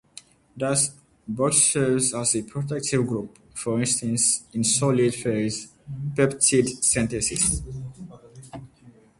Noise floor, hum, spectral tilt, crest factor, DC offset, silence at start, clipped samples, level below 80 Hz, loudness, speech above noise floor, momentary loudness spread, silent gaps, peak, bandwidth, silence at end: -53 dBFS; none; -3.5 dB/octave; 20 dB; under 0.1%; 0.55 s; under 0.1%; -48 dBFS; -22 LUFS; 29 dB; 18 LU; none; -6 dBFS; 12 kHz; 0.3 s